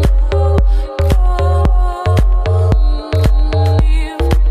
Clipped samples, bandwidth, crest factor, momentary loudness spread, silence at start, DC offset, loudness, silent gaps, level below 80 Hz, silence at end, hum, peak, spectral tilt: under 0.1%; 10 kHz; 10 dB; 3 LU; 0 s; under 0.1%; -14 LUFS; none; -12 dBFS; 0 s; none; 0 dBFS; -7.5 dB/octave